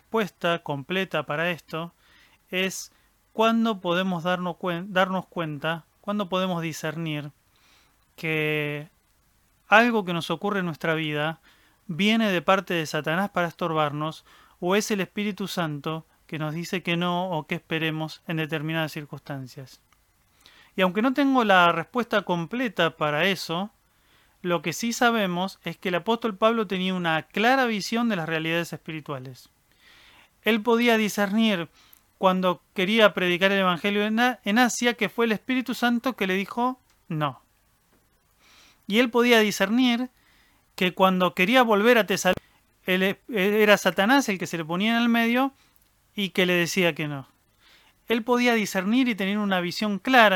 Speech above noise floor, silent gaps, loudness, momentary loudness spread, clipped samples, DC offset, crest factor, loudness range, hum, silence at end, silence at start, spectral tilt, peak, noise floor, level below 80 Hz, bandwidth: 41 dB; none; -24 LUFS; 13 LU; under 0.1%; under 0.1%; 24 dB; 6 LU; none; 0 s; 0.15 s; -4.5 dB/octave; -2 dBFS; -65 dBFS; -66 dBFS; 18.5 kHz